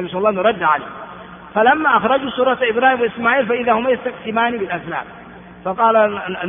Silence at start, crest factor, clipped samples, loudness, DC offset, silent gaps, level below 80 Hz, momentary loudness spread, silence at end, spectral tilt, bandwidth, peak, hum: 0 s; 16 dB; under 0.1%; -17 LUFS; under 0.1%; none; -54 dBFS; 14 LU; 0 s; -2.5 dB/octave; 3.7 kHz; 0 dBFS; none